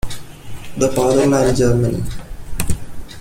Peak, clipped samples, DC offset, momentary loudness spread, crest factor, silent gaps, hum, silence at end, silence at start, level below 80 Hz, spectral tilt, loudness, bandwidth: -2 dBFS; under 0.1%; under 0.1%; 20 LU; 16 dB; none; none; 0 s; 0.05 s; -30 dBFS; -6 dB/octave; -17 LUFS; 16.5 kHz